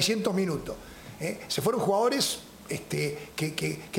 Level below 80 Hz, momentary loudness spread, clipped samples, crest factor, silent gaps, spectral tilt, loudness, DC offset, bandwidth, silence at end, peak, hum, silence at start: -56 dBFS; 12 LU; under 0.1%; 18 dB; none; -4 dB/octave; -29 LUFS; under 0.1%; 17 kHz; 0 s; -10 dBFS; none; 0 s